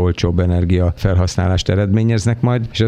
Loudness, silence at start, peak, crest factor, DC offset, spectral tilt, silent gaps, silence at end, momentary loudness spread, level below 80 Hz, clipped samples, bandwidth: -16 LUFS; 0 s; -2 dBFS; 14 dB; under 0.1%; -6.5 dB/octave; none; 0 s; 2 LU; -30 dBFS; under 0.1%; 9.8 kHz